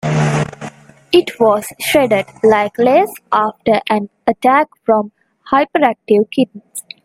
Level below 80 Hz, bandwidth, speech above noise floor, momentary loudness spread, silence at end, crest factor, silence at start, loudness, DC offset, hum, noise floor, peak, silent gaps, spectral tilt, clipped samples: -52 dBFS; 16 kHz; 19 dB; 7 LU; 0.25 s; 14 dB; 0.05 s; -15 LUFS; under 0.1%; none; -33 dBFS; 0 dBFS; none; -5.5 dB/octave; under 0.1%